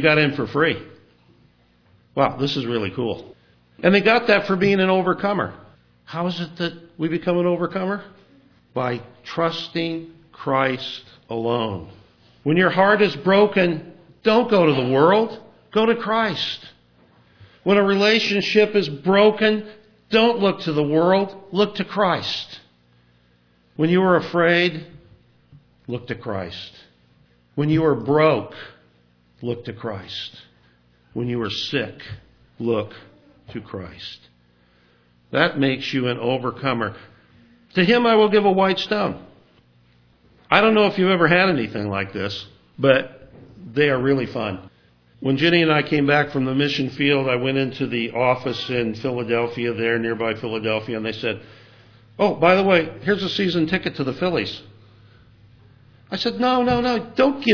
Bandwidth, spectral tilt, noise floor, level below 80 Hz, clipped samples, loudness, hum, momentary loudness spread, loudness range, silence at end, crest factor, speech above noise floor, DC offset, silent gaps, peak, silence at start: 5.4 kHz; -6.5 dB/octave; -59 dBFS; -56 dBFS; under 0.1%; -20 LUFS; 60 Hz at -50 dBFS; 16 LU; 8 LU; 0 s; 22 dB; 39 dB; under 0.1%; none; 0 dBFS; 0 s